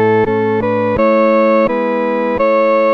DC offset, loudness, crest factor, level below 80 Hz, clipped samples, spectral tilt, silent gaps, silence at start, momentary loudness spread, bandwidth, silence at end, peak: 0.3%; -13 LUFS; 10 dB; -42 dBFS; under 0.1%; -8.5 dB/octave; none; 0 s; 5 LU; 5.8 kHz; 0 s; -2 dBFS